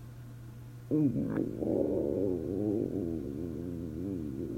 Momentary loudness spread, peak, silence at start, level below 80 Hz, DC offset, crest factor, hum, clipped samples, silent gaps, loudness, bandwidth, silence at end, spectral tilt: 17 LU; -16 dBFS; 0 s; -54 dBFS; under 0.1%; 18 dB; none; under 0.1%; none; -33 LUFS; 16 kHz; 0 s; -10 dB/octave